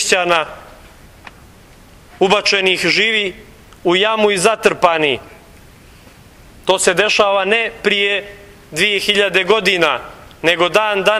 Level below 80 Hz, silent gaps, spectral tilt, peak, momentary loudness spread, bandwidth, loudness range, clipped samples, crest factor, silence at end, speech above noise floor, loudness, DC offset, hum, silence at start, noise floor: -48 dBFS; none; -2.5 dB/octave; 0 dBFS; 10 LU; 15.5 kHz; 3 LU; under 0.1%; 16 dB; 0 s; 28 dB; -14 LUFS; under 0.1%; none; 0 s; -43 dBFS